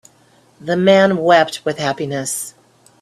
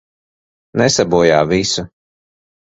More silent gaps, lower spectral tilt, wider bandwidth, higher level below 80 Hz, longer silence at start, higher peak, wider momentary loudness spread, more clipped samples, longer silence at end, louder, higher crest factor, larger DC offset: neither; about the same, -4.5 dB/octave vs -4 dB/octave; first, 14 kHz vs 8.2 kHz; second, -60 dBFS vs -44 dBFS; about the same, 0.65 s vs 0.75 s; about the same, 0 dBFS vs 0 dBFS; about the same, 13 LU vs 11 LU; neither; second, 0.5 s vs 0.8 s; about the same, -16 LUFS vs -14 LUFS; about the same, 16 dB vs 16 dB; neither